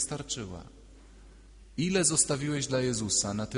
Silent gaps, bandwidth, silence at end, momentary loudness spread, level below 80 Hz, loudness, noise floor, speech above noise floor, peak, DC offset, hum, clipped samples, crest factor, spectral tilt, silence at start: none; 11 kHz; 0 s; 16 LU; -52 dBFS; -28 LUFS; -52 dBFS; 22 dB; -10 dBFS; under 0.1%; none; under 0.1%; 20 dB; -3.5 dB/octave; 0 s